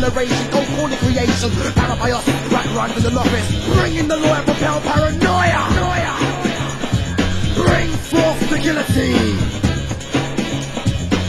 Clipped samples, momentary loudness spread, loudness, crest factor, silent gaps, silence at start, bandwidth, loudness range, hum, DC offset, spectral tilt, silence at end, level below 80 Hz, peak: under 0.1%; 5 LU; -17 LUFS; 16 dB; none; 0 s; 16 kHz; 1 LU; none; under 0.1%; -5 dB/octave; 0 s; -28 dBFS; 0 dBFS